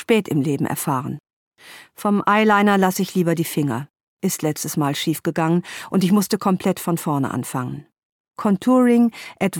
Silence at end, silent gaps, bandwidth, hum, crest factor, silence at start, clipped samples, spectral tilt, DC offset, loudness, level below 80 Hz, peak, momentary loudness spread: 0 s; 1.33-1.52 s, 4.03-4.17 s, 8.05-8.24 s; 18.5 kHz; none; 16 dB; 0 s; under 0.1%; -5.5 dB/octave; under 0.1%; -20 LUFS; -64 dBFS; -4 dBFS; 11 LU